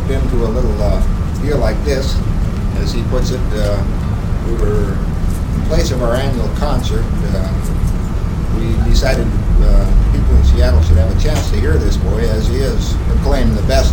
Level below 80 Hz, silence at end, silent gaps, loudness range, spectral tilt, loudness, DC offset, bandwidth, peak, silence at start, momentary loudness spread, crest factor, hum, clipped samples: -14 dBFS; 0 s; none; 4 LU; -6.5 dB/octave; -16 LUFS; under 0.1%; 17 kHz; 0 dBFS; 0 s; 6 LU; 12 dB; none; under 0.1%